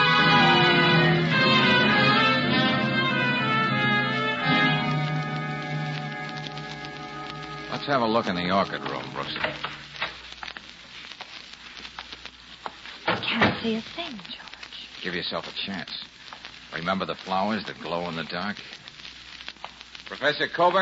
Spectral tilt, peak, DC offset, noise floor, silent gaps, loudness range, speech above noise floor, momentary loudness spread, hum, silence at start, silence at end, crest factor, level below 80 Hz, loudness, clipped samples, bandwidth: -5.5 dB/octave; -8 dBFS; under 0.1%; -44 dBFS; none; 13 LU; 17 dB; 21 LU; none; 0 s; 0 s; 18 dB; -58 dBFS; -24 LUFS; under 0.1%; 8 kHz